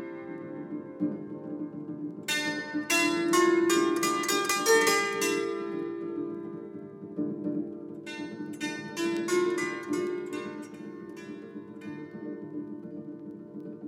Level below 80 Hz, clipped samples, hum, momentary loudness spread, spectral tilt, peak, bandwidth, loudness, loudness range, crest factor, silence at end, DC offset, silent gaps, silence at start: -80 dBFS; under 0.1%; none; 18 LU; -3 dB/octave; -12 dBFS; 17 kHz; -29 LUFS; 12 LU; 20 dB; 0 s; under 0.1%; none; 0 s